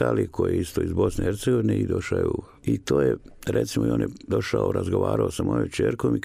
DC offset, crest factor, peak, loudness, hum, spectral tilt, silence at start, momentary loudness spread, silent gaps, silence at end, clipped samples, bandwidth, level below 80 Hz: under 0.1%; 16 dB; -8 dBFS; -25 LUFS; none; -7 dB/octave; 0 s; 5 LU; none; 0 s; under 0.1%; 15.5 kHz; -44 dBFS